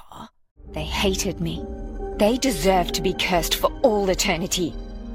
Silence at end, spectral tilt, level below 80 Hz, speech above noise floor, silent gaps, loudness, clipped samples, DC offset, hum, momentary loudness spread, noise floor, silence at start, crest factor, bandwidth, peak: 0 s; -3.5 dB/octave; -34 dBFS; 21 dB; 0.51-0.56 s; -22 LUFS; under 0.1%; under 0.1%; none; 14 LU; -43 dBFS; 0.05 s; 18 dB; 16.5 kHz; -4 dBFS